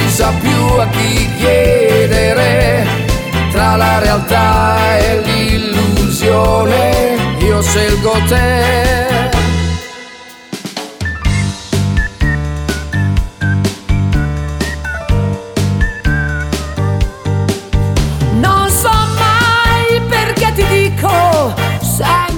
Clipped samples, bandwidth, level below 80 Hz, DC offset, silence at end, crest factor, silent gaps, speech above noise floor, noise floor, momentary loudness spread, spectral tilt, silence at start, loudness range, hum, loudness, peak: under 0.1%; 19 kHz; -20 dBFS; under 0.1%; 0 s; 12 dB; none; 23 dB; -33 dBFS; 8 LU; -5 dB/octave; 0 s; 5 LU; none; -12 LUFS; 0 dBFS